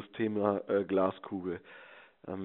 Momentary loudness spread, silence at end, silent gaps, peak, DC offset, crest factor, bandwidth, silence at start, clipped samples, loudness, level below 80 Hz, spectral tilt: 20 LU; 0 s; none; -12 dBFS; under 0.1%; 20 dB; 4 kHz; 0 s; under 0.1%; -33 LUFS; -76 dBFS; -6 dB/octave